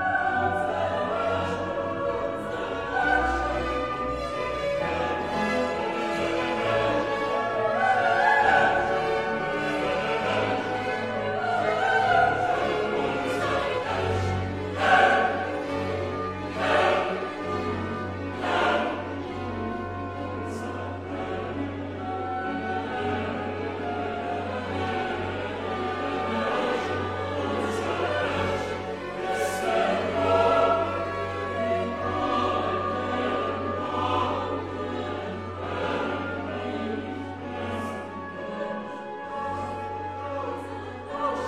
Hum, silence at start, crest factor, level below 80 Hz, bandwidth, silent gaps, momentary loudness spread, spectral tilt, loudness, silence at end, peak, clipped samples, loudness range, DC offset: none; 0 s; 20 dB; -50 dBFS; 14 kHz; none; 11 LU; -5.5 dB/octave; -27 LUFS; 0 s; -6 dBFS; under 0.1%; 8 LU; 0.1%